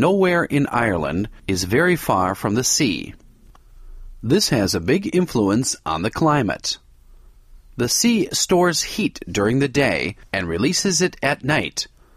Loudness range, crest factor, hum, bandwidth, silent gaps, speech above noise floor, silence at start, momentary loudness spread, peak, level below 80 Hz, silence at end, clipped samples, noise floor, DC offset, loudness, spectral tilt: 2 LU; 16 dB; none; 15.5 kHz; none; 28 dB; 0 s; 8 LU; -4 dBFS; -44 dBFS; 0.3 s; under 0.1%; -47 dBFS; under 0.1%; -20 LUFS; -4 dB/octave